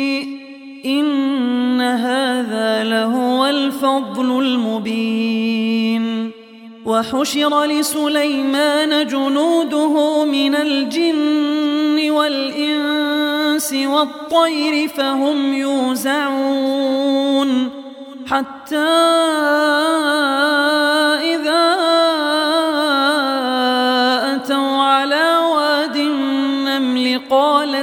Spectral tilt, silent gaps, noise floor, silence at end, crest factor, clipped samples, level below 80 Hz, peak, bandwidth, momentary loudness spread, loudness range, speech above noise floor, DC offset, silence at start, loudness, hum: -3 dB/octave; none; -38 dBFS; 0 s; 14 dB; under 0.1%; -66 dBFS; -2 dBFS; 17 kHz; 5 LU; 3 LU; 22 dB; under 0.1%; 0 s; -16 LUFS; none